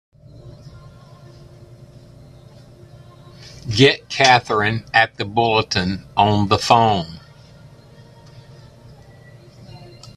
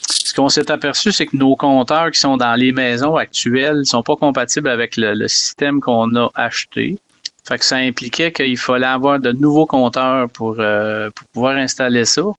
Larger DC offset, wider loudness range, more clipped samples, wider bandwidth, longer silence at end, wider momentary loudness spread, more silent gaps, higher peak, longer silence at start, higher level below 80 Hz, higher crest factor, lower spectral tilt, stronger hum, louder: neither; first, 7 LU vs 3 LU; neither; first, 13 kHz vs 11.5 kHz; first, 0.3 s vs 0.05 s; first, 20 LU vs 6 LU; neither; about the same, 0 dBFS vs -2 dBFS; first, 0.45 s vs 0 s; about the same, -50 dBFS vs -54 dBFS; first, 22 dB vs 14 dB; about the same, -4.5 dB/octave vs -3.5 dB/octave; neither; about the same, -16 LUFS vs -15 LUFS